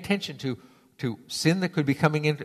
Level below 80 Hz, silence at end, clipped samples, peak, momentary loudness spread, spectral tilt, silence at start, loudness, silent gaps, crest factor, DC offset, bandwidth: -64 dBFS; 0 s; under 0.1%; -6 dBFS; 10 LU; -5.5 dB/octave; 0 s; -27 LUFS; none; 22 dB; under 0.1%; 14 kHz